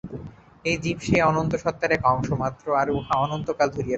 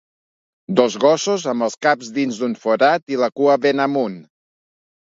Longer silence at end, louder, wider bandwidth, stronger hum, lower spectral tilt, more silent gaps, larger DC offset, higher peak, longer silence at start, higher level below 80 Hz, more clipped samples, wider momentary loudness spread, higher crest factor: second, 0 s vs 0.85 s; second, -24 LUFS vs -18 LUFS; about the same, 8.2 kHz vs 7.8 kHz; neither; first, -6 dB/octave vs -4.5 dB/octave; second, none vs 3.02-3.07 s; neither; second, -6 dBFS vs 0 dBFS; second, 0.05 s vs 0.7 s; first, -46 dBFS vs -70 dBFS; neither; about the same, 8 LU vs 7 LU; about the same, 18 dB vs 18 dB